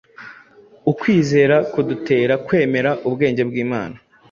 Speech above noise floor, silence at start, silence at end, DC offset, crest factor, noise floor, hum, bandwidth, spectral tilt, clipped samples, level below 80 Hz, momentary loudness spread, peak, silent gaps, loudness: 30 dB; 0.2 s; 0.35 s; under 0.1%; 16 dB; -47 dBFS; none; 7.4 kHz; -7 dB/octave; under 0.1%; -56 dBFS; 11 LU; -2 dBFS; none; -18 LUFS